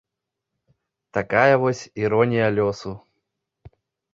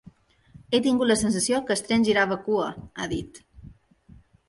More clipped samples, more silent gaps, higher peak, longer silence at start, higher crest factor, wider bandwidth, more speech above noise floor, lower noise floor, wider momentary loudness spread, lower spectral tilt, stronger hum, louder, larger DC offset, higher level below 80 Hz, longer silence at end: neither; neither; first, -2 dBFS vs -8 dBFS; first, 1.15 s vs 0.7 s; about the same, 22 dB vs 18 dB; second, 7.8 kHz vs 11.5 kHz; first, 63 dB vs 30 dB; first, -83 dBFS vs -54 dBFS; first, 16 LU vs 11 LU; first, -6.5 dB/octave vs -4 dB/octave; neither; first, -20 LUFS vs -24 LUFS; neither; about the same, -56 dBFS vs -52 dBFS; second, 0.45 s vs 0.75 s